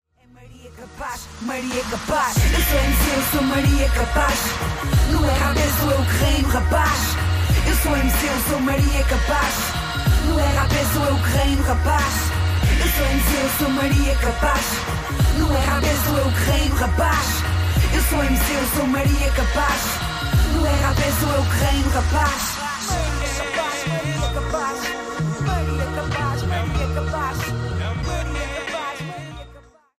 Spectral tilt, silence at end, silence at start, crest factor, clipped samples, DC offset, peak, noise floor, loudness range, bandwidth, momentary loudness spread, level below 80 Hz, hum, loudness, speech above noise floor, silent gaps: -4.5 dB/octave; 0.4 s; 0.4 s; 14 dB; under 0.1%; under 0.1%; -6 dBFS; -47 dBFS; 5 LU; 15.5 kHz; 7 LU; -24 dBFS; none; -20 LUFS; 28 dB; none